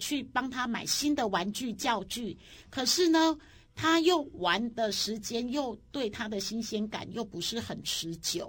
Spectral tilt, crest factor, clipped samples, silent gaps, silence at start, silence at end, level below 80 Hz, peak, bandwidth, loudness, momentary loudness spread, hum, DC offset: -3 dB/octave; 20 dB; under 0.1%; none; 0 s; 0 s; -60 dBFS; -12 dBFS; 17 kHz; -30 LUFS; 11 LU; none; under 0.1%